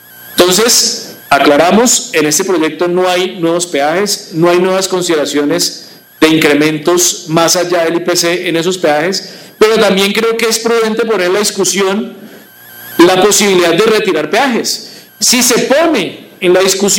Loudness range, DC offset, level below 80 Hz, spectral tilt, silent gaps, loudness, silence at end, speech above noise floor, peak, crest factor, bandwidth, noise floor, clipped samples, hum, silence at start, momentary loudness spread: 2 LU; under 0.1%; -52 dBFS; -2.5 dB/octave; none; -10 LUFS; 0 s; 25 dB; 0 dBFS; 10 dB; 17 kHz; -35 dBFS; under 0.1%; none; 0.15 s; 8 LU